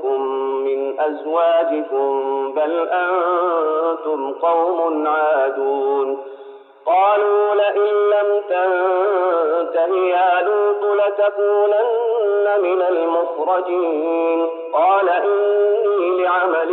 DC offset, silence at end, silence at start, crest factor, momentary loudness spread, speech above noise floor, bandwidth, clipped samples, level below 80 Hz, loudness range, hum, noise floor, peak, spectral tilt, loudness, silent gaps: under 0.1%; 0 s; 0 s; 10 dB; 5 LU; 23 dB; 4.1 kHz; under 0.1%; -90 dBFS; 2 LU; none; -40 dBFS; -6 dBFS; 1 dB/octave; -18 LUFS; none